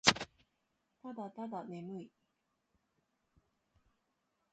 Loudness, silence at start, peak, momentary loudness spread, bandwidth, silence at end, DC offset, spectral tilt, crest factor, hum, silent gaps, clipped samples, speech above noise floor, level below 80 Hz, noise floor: -41 LUFS; 0.05 s; -8 dBFS; 11 LU; 8.8 kHz; 2.45 s; under 0.1%; -2 dB/octave; 34 dB; none; none; under 0.1%; 38 dB; -72 dBFS; -83 dBFS